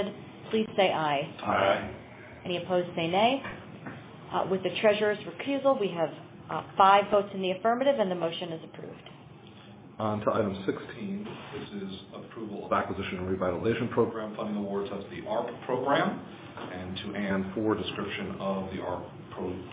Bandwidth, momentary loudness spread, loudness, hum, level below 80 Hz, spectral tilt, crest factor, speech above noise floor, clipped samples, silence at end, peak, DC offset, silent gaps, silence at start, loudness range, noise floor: 4 kHz; 18 LU; -29 LUFS; none; -58 dBFS; -4 dB/octave; 22 dB; 20 dB; under 0.1%; 0 s; -8 dBFS; under 0.1%; none; 0 s; 7 LU; -49 dBFS